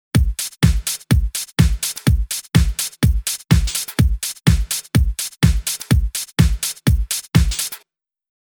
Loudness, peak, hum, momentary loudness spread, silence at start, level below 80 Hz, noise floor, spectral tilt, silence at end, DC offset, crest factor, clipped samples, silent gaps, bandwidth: -19 LUFS; 0 dBFS; none; 5 LU; 0.15 s; -22 dBFS; -61 dBFS; -4.5 dB/octave; 0.8 s; under 0.1%; 18 dB; under 0.1%; none; over 20 kHz